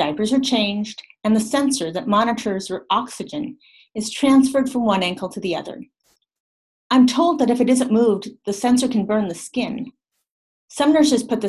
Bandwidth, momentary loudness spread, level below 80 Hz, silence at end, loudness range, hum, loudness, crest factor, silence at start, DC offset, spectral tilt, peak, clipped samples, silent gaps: 12.5 kHz; 13 LU; -58 dBFS; 0 s; 3 LU; none; -19 LUFS; 16 dB; 0 s; under 0.1%; -4.5 dB/octave; -4 dBFS; under 0.1%; 6.40-6.90 s, 10.31-10.68 s